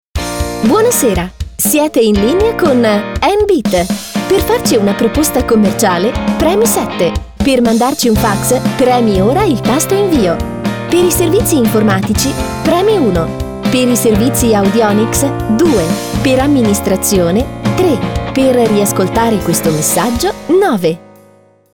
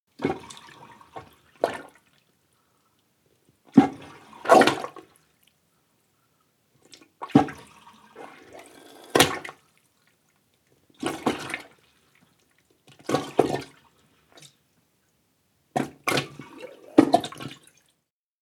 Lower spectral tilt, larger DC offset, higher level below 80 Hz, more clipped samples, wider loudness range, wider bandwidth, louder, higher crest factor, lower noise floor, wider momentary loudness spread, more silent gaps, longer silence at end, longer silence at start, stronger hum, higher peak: about the same, -5 dB/octave vs -4.5 dB/octave; neither; first, -28 dBFS vs -66 dBFS; neither; second, 1 LU vs 11 LU; about the same, over 20 kHz vs 19 kHz; first, -12 LUFS vs -24 LUFS; second, 10 dB vs 28 dB; second, -45 dBFS vs -77 dBFS; second, 6 LU vs 26 LU; neither; second, 0.75 s vs 0.9 s; about the same, 0.15 s vs 0.2 s; neither; about the same, -2 dBFS vs 0 dBFS